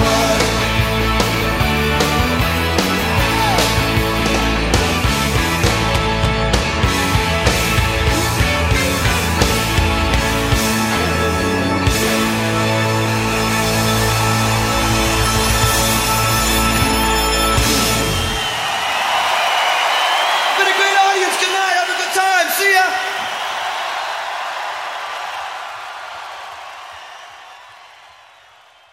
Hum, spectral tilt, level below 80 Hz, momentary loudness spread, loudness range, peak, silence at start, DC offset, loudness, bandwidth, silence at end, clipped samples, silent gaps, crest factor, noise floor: none; -3.5 dB/octave; -26 dBFS; 9 LU; 9 LU; 0 dBFS; 0 s; under 0.1%; -15 LUFS; 16.5 kHz; 1.05 s; under 0.1%; none; 16 dB; -47 dBFS